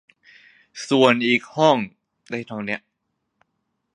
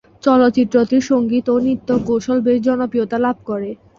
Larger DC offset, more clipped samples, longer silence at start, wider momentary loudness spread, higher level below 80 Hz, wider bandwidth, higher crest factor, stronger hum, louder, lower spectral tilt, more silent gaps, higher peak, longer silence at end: neither; neither; first, 0.75 s vs 0.25 s; first, 18 LU vs 6 LU; second, -70 dBFS vs -52 dBFS; first, 10.5 kHz vs 7.4 kHz; first, 22 dB vs 14 dB; neither; second, -20 LUFS vs -17 LUFS; second, -5 dB/octave vs -6.5 dB/octave; neither; about the same, 0 dBFS vs -2 dBFS; first, 1.15 s vs 0.25 s